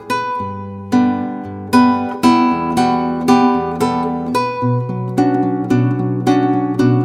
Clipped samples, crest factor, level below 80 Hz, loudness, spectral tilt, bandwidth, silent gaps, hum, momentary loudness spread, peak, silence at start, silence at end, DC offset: under 0.1%; 14 dB; -50 dBFS; -16 LUFS; -7 dB/octave; 14.5 kHz; none; none; 8 LU; 0 dBFS; 0 s; 0 s; under 0.1%